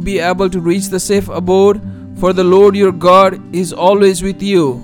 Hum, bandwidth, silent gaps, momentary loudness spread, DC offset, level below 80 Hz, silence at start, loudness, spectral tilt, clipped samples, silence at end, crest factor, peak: none; 17 kHz; none; 9 LU; under 0.1%; -36 dBFS; 0 s; -12 LUFS; -5.5 dB/octave; 0.3%; 0 s; 12 dB; 0 dBFS